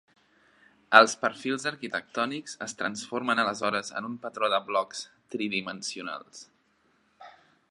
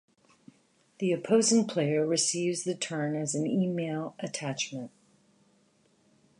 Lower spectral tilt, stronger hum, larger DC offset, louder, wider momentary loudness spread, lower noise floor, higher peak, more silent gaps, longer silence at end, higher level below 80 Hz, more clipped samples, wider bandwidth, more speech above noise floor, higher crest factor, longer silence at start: second, -2.5 dB/octave vs -4 dB/octave; neither; neither; about the same, -27 LUFS vs -29 LUFS; first, 18 LU vs 11 LU; about the same, -68 dBFS vs -67 dBFS; first, 0 dBFS vs -12 dBFS; neither; second, 0.4 s vs 1.5 s; about the same, -78 dBFS vs -80 dBFS; neither; about the same, 11 kHz vs 11.5 kHz; about the same, 40 dB vs 38 dB; first, 28 dB vs 18 dB; about the same, 0.9 s vs 1 s